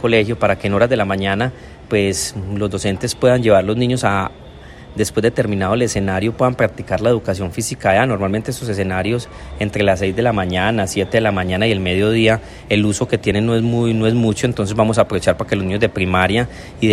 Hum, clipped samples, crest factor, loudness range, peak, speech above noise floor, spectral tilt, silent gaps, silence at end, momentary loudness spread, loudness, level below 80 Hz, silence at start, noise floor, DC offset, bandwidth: none; under 0.1%; 16 dB; 2 LU; 0 dBFS; 20 dB; -5.5 dB/octave; none; 0 s; 7 LU; -17 LUFS; -40 dBFS; 0 s; -37 dBFS; under 0.1%; 14.5 kHz